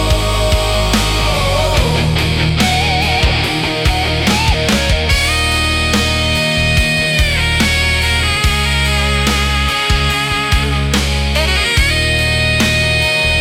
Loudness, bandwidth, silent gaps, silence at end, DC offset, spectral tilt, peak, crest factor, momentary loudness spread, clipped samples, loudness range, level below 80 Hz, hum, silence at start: -13 LUFS; 17 kHz; none; 0 s; under 0.1%; -4 dB/octave; -2 dBFS; 12 dB; 2 LU; under 0.1%; 1 LU; -20 dBFS; none; 0 s